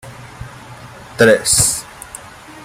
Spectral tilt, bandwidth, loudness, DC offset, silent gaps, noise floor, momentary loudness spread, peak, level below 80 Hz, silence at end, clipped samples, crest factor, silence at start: -2.5 dB/octave; 16 kHz; -12 LUFS; under 0.1%; none; -36 dBFS; 25 LU; 0 dBFS; -42 dBFS; 0 s; under 0.1%; 18 dB; 0.05 s